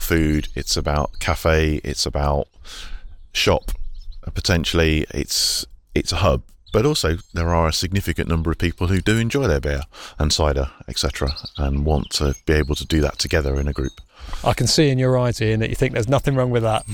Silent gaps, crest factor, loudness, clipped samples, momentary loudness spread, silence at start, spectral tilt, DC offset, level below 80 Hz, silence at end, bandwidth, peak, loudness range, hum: none; 14 dB; -20 LUFS; under 0.1%; 8 LU; 0 s; -4.5 dB/octave; under 0.1%; -28 dBFS; 0 s; 17.5 kHz; -6 dBFS; 2 LU; none